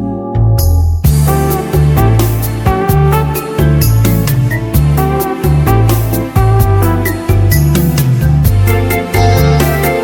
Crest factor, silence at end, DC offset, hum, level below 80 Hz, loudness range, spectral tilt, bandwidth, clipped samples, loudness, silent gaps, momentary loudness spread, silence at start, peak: 10 dB; 0 s; under 0.1%; none; -18 dBFS; 1 LU; -6.5 dB/octave; over 20 kHz; 0.2%; -11 LUFS; none; 4 LU; 0 s; 0 dBFS